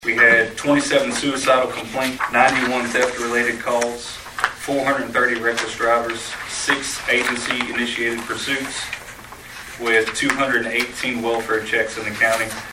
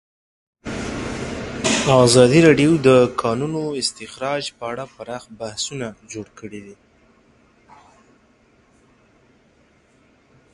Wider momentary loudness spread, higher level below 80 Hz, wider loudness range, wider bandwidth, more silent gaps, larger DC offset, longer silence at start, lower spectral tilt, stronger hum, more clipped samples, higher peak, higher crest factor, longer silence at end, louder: second, 10 LU vs 22 LU; about the same, -50 dBFS vs -48 dBFS; second, 3 LU vs 17 LU; first, 16 kHz vs 11.5 kHz; neither; neither; second, 0 s vs 0.65 s; second, -2.5 dB/octave vs -5 dB/octave; neither; neither; about the same, 0 dBFS vs 0 dBFS; about the same, 20 dB vs 20 dB; second, 0 s vs 3.8 s; about the same, -19 LUFS vs -18 LUFS